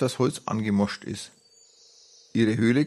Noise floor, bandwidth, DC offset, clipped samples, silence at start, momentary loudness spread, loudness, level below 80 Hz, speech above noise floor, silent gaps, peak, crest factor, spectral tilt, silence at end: -57 dBFS; 12.5 kHz; under 0.1%; under 0.1%; 0 s; 14 LU; -26 LUFS; -66 dBFS; 32 dB; none; -10 dBFS; 16 dB; -6 dB/octave; 0 s